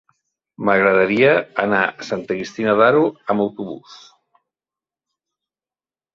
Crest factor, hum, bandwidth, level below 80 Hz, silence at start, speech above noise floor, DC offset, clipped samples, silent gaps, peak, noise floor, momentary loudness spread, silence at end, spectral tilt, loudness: 18 dB; none; 7.4 kHz; -60 dBFS; 0.6 s; over 72 dB; under 0.1%; under 0.1%; none; -2 dBFS; under -90 dBFS; 13 LU; 2.2 s; -6.5 dB/octave; -17 LUFS